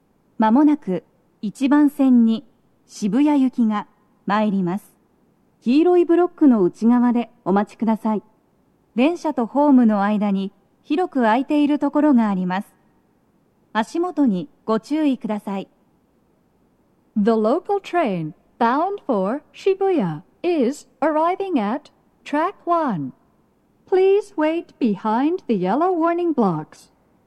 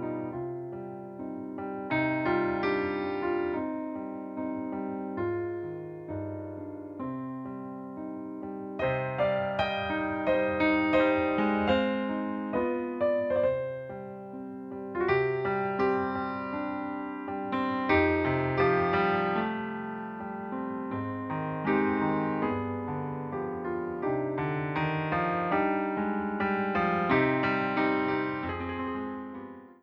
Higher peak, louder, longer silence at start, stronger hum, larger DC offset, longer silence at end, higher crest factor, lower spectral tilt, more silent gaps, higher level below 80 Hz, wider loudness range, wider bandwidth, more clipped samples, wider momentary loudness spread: first, -4 dBFS vs -12 dBFS; first, -20 LUFS vs -30 LUFS; first, 0.4 s vs 0 s; neither; neither; first, 0.65 s vs 0.1 s; about the same, 16 dB vs 18 dB; about the same, -7.5 dB/octave vs -8.5 dB/octave; neither; second, -70 dBFS vs -58 dBFS; second, 5 LU vs 8 LU; first, 12 kHz vs 6 kHz; neither; about the same, 11 LU vs 13 LU